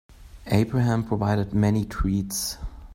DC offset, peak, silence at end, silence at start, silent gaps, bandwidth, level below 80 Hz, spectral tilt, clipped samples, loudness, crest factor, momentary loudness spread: under 0.1%; -6 dBFS; 0 s; 0.1 s; none; 16.5 kHz; -38 dBFS; -6 dB/octave; under 0.1%; -24 LUFS; 18 dB; 7 LU